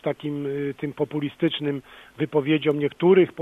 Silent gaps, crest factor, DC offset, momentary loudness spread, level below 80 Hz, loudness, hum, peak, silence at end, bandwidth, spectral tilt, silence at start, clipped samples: none; 16 dB; under 0.1%; 11 LU; -64 dBFS; -24 LUFS; none; -6 dBFS; 0 s; 4 kHz; -8 dB/octave; 0.05 s; under 0.1%